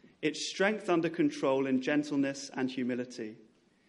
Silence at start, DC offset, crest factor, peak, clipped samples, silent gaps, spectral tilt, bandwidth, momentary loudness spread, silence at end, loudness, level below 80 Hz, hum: 0.2 s; under 0.1%; 18 dB; -14 dBFS; under 0.1%; none; -4.5 dB/octave; 11.5 kHz; 8 LU; 0.55 s; -32 LUFS; -80 dBFS; none